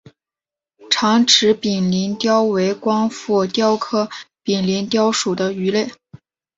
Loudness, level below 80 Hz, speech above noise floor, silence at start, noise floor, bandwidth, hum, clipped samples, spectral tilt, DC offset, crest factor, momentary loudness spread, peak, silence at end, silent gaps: -17 LUFS; -60 dBFS; 72 dB; 0.8 s; -90 dBFS; 8 kHz; none; under 0.1%; -4 dB/octave; under 0.1%; 18 dB; 9 LU; 0 dBFS; 0.4 s; none